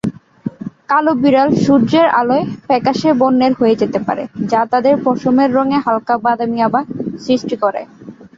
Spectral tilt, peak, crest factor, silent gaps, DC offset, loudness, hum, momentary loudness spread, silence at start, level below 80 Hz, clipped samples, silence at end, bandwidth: -7 dB/octave; -2 dBFS; 12 dB; none; under 0.1%; -14 LUFS; none; 12 LU; 0.05 s; -54 dBFS; under 0.1%; 0.1 s; 7.6 kHz